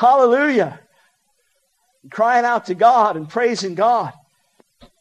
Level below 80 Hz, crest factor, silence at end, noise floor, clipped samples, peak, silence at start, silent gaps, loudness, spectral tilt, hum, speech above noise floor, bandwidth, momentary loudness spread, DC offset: -68 dBFS; 16 dB; 0.9 s; -66 dBFS; under 0.1%; -2 dBFS; 0 s; none; -17 LUFS; -5 dB/octave; none; 50 dB; 9.6 kHz; 8 LU; under 0.1%